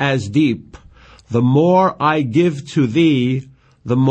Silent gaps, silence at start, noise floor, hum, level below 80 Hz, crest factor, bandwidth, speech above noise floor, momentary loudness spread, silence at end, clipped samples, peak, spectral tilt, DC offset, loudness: none; 0 s; -44 dBFS; none; -50 dBFS; 12 dB; 8.8 kHz; 29 dB; 9 LU; 0 s; under 0.1%; -4 dBFS; -7.5 dB/octave; under 0.1%; -16 LUFS